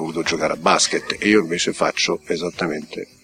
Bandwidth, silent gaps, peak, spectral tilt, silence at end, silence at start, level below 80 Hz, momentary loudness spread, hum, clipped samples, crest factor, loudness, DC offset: 15 kHz; none; -2 dBFS; -3 dB/octave; 0.2 s; 0 s; -54 dBFS; 9 LU; none; under 0.1%; 20 dB; -19 LUFS; under 0.1%